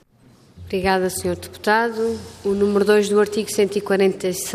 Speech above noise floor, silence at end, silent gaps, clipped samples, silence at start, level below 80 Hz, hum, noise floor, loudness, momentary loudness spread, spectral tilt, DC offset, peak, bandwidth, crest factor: 33 dB; 0 s; none; under 0.1%; 0.55 s; -52 dBFS; none; -52 dBFS; -20 LUFS; 9 LU; -4.5 dB/octave; under 0.1%; -4 dBFS; 15.5 kHz; 16 dB